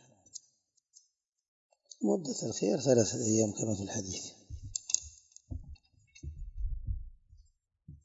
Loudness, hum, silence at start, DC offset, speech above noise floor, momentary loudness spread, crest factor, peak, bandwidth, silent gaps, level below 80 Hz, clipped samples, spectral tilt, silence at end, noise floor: -33 LUFS; none; 0.35 s; under 0.1%; 43 dB; 22 LU; 30 dB; -6 dBFS; 8 kHz; 1.48-1.70 s; -48 dBFS; under 0.1%; -4.5 dB/octave; 0.1 s; -74 dBFS